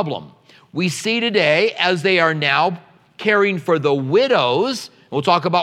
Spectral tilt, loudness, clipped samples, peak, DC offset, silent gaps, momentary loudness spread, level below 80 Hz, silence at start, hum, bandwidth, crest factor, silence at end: -4.5 dB/octave; -17 LUFS; under 0.1%; 0 dBFS; under 0.1%; none; 10 LU; -72 dBFS; 0 s; none; 14.5 kHz; 18 dB; 0 s